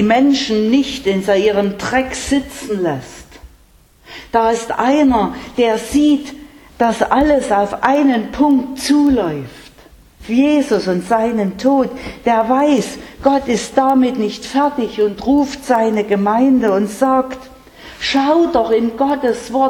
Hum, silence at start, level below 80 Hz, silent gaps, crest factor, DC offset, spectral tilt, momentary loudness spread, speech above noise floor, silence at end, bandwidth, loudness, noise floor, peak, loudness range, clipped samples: none; 0 s; -42 dBFS; none; 14 dB; under 0.1%; -5 dB/octave; 8 LU; 34 dB; 0 s; 13.5 kHz; -15 LUFS; -49 dBFS; 0 dBFS; 3 LU; under 0.1%